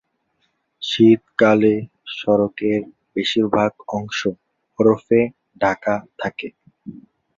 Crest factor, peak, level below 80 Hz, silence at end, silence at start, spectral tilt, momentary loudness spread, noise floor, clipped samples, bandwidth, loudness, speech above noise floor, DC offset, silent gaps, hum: 18 dB; -2 dBFS; -56 dBFS; 0.4 s; 0.8 s; -6 dB/octave; 16 LU; -69 dBFS; under 0.1%; 7.6 kHz; -19 LUFS; 51 dB; under 0.1%; none; none